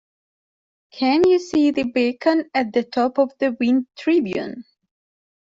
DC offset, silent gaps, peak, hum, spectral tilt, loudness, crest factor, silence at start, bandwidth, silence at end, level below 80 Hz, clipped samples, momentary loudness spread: under 0.1%; none; -4 dBFS; none; -5.5 dB/octave; -20 LUFS; 16 dB; 0.95 s; 7.8 kHz; 0.8 s; -60 dBFS; under 0.1%; 7 LU